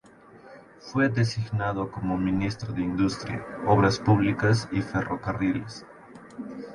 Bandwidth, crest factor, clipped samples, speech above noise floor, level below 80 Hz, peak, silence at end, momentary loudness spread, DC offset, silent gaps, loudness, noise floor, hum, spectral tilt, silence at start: 11.5 kHz; 18 dB; under 0.1%; 26 dB; -50 dBFS; -8 dBFS; 0 s; 17 LU; under 0.1%; none; -26 LUFS; -51 dBFS; none; -6.5 dB/octave; 0.35 s